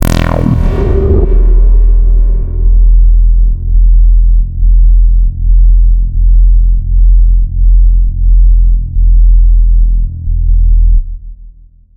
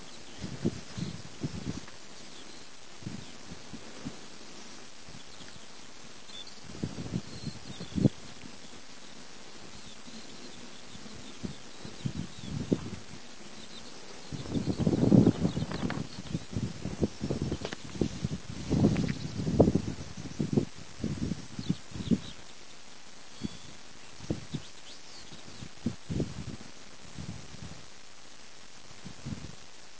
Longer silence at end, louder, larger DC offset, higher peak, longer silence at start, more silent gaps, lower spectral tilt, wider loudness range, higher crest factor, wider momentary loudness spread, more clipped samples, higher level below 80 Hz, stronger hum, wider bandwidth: first, 0.45 s vs 0 s; first, -11 LUFS vs -34 LUFS; second, under 0.1% vs 0.7%; first, 0 dBFS vs -8 dBFS; about the same, 0 s vs 0 s; neither; first, -8 dB/octave vs -6.5 dB/octave; second, 1 LU vs 15 LU; second, 6 dB vs 28 dB; second, 4 LU vs 18 LU; first, 0.2% vs under 0.1%; first, -6 dBFS vs -50 dBFS; neither; second, 3.3 kHz vs 8 kHz